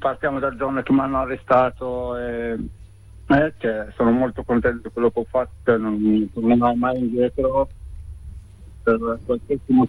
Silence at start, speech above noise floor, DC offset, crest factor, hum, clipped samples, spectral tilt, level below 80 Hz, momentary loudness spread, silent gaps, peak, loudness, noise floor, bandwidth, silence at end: 0 s; 22 dB; under 0.1%; 16 dB; none; under 0.1%; -8.5 dB/octave; -40 dBFS; 10 LU; none; -6 dBFS; -21 LUFS; -42 dBFS; 10.5 kHz; 0 s